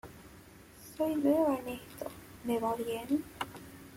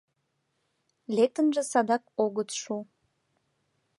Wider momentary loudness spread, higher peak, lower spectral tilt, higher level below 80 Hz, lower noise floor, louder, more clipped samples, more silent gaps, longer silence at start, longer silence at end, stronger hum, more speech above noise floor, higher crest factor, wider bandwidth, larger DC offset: first, 24 LU vs 10 LU; second, -16 dBFS vs -10 dBFS; first, -5.5 dB/octave vs -4 dB/octave; first, -64 dBFS vs -84 dBFS; second, -55 dBFS vs -77 dBFS; second, -34 LUFS vs -28 LUFS; neither; neither; second, 0.05 s vs 1.1 s; second, 0 s vs 1.15 s; neither; second, 23 dB vs 50 dB; about the same, 18 dB vs 20 dB; first, 16.5 kHz vs 11.5 kHz; neither